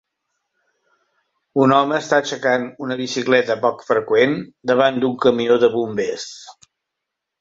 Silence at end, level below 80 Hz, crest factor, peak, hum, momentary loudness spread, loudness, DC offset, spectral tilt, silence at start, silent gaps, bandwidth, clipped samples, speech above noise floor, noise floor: 0.9 s; -62 dBFS; 18 dB; -2 dBFS; none; 10 LU; -18 LUFS; under 0.1%; -5 dB/octave; 1.55 s; none; 7.8 kHz; under 0.1%; 63 dB; -81 dBFS